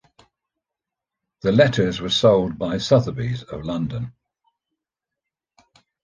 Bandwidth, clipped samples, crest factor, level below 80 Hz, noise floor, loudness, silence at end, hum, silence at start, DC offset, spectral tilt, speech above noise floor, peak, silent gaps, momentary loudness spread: 9.6 kHz; under 0.1%; 20 dB; -50 dBFS; -86 dBFS; -20 LUFS; 1.95 s; none; 1.45 s; under 0.1%; -6 dB/octave; 67 dB; -2 dBFS; none; 12 LU